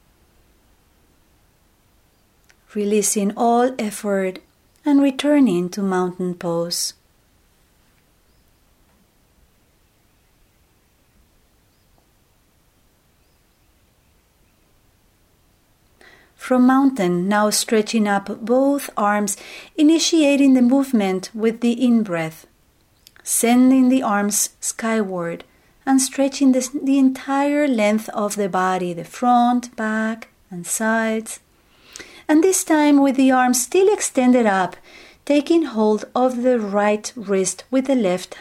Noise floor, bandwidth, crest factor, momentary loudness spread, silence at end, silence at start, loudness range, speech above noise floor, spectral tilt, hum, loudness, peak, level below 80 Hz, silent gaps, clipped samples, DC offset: -59 dBFS; 16 kHz; 16 dB; 11 LU; 0 s; 2.75 s; 6 LU; 41 dB; -4 dB/octave; none; -18 LUFS; -4 dBFS; -62 dBFS; none; under 0.1%; under 0.1%